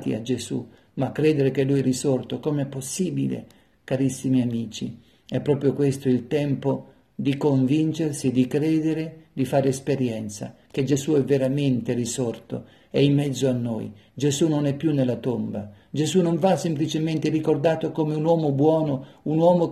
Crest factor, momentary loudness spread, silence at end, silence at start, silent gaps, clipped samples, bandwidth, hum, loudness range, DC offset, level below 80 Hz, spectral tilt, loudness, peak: 16 dB; 11 LU; 0 s; 0 s; none; under 0.1%; 13.5 kHz; none; 3 LU; under 0.1%; -62 dBFS; -6.5 dB/octave; -24 LUFS; -6 dBFS